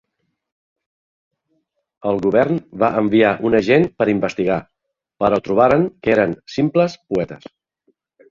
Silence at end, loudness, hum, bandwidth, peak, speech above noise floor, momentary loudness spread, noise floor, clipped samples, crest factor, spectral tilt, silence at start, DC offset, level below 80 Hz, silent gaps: 0.95 s; -17 LUFS; none; 7.4 kHz; -2 dBFS; 52 dB; 9 LU; -69 dBFS; under 0.1%; 18 dB; -7.5 dB/octave; 2.05 s; under 0.1%; -52 dBFS; none